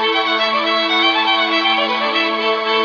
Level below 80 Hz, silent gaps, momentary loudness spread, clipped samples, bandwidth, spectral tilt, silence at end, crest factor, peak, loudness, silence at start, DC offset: -68 dBFS; none; 3 LU; under 0.1%; 5.4 kHz; -2.5 dB/octave; 0 s; 12 dB; -4 dBFS; -15 LUFS; 0 s; under 0.1%